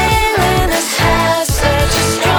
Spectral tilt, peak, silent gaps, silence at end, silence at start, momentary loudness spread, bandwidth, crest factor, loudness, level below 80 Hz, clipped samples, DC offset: -3.5 dB/octave; 0 dBFS; none; 0 s; 0 s; 2 LU; over 20 kHz; 12 dB; -13 LUFS; -22 dBFS; under 0.1%; under 0.1%